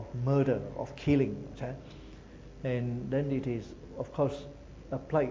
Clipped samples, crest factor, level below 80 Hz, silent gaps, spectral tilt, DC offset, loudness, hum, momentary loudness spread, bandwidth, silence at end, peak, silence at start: under 0.1%; 18 dB; -52 dBFS; none; -8.5 dB/octave; under 0.1%; -33 LUFS; none; 21 LU; 7.6 kHz; 0 s; -14 dBFS; 0 s